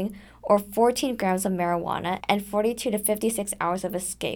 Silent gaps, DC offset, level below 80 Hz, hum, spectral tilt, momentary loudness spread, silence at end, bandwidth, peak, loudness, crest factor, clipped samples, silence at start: none; under 0.1%; -54 dBFS; none; -4 dB/octave; 6 LU; 0 s; over 20 kHz; -6 dBFS; -25 LUFS; 20 dB; under 0.1%; 0 s